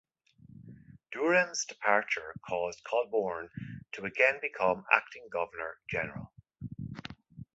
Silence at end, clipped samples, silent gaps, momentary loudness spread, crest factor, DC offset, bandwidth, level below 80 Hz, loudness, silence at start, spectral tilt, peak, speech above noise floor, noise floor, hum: 0.1 s; under 0.1%; none; 18 LU; 26 dB; under 0.1%; 8 kHz; -64 dBFS; -31 LUFS; 0.5 s; -4 dB/octave; -8 dBFS; 27 dB; -59 dBFS; none